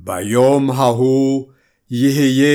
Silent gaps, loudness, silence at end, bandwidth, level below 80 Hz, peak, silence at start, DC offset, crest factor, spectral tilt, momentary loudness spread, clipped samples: none; -15 LUFS; 0 s; 17 kHz; -62 dBFS; -2 dBFS; 0.05 s; under 0.1%; 12 dB; -6 dB/octave; 6 LU; under 0.1%